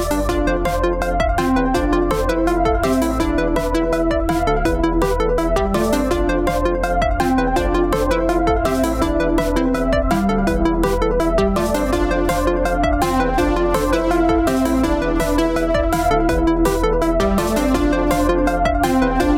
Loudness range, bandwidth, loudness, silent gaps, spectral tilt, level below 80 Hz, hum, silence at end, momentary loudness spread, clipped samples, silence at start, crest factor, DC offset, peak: 1 LU; 17 kHz; -18 LUFS; none; -6 dB/octave; -24 dBFS; none; 0 s; 2 LU; under 0.1%; 0 s; 12 dB; under 0.1%; -6 dBFS